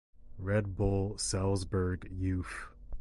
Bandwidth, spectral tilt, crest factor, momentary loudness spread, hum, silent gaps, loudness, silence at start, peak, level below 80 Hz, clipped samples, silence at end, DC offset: 11.5 kHz; -5.5 dB/octave; 18 dB; 11 LU; none; none; -34 LUFS; 0.2 s; -16 dBFS; -44 dBFS; under 0.1%; 0 s; under 0.1%